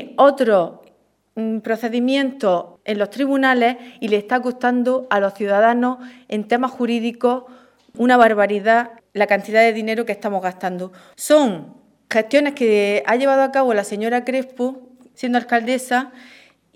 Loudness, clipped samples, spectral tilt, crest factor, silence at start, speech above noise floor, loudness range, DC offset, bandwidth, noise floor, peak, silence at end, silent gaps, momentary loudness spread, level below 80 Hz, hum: -18 LUFS; under 0.1%; -4.5 dB/octave; 18 dB; 0 s; 39 dB; 3 LU; under 0.1%; 15 kHz; -57 dBFS; 0 dBFS; 0.65 s; none; 11 LU; -70 dBFS; none